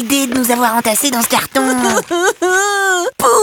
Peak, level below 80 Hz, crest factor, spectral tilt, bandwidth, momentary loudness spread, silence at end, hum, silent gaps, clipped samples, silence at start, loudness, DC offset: 0 dBFS; -52 dBFS; 14 dB; -1.5 dB/octave; 19 kHz; 2 LU; 0 s; none; none; under 0.1%; 0 s; -13 LUFS; under 0.1%